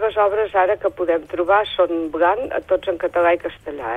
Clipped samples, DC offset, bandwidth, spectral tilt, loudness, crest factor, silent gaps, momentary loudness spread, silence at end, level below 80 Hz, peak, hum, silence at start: under 0.1%; under 0.1%; 8.4 kHz; -6 dB/octave; -19 LUFS; 14 dB; none; 5 LU; 0 s; -50 dBFS; -4 dBFS; none; 0 s